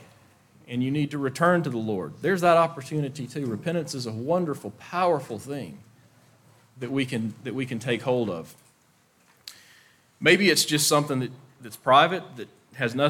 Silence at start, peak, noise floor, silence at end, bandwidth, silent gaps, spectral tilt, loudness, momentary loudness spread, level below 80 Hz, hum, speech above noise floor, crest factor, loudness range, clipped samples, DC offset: 0 s; -4 dBFS; -63 dBFS; 0 s; 18 kHz; none; -4.5 dB/octave; -25 LUFS; 21 LU; -70 dBFS; none; 38 dB; 22 dB; 8 LU; under 0.1%; under 0.1%